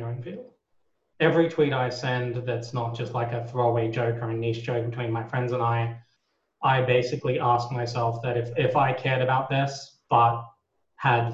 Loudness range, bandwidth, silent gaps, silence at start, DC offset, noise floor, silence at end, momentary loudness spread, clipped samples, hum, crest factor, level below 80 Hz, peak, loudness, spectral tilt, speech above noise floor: 3 LU; 7.8 kHz; none; 0 s; under 0.1%; -74 dBFS; 0 s; 9 LU; under 0.1%; none; 20 dB; -60 dBFS; -6 dBFS; -26 LUFS; -7 dB/octave; 49 dB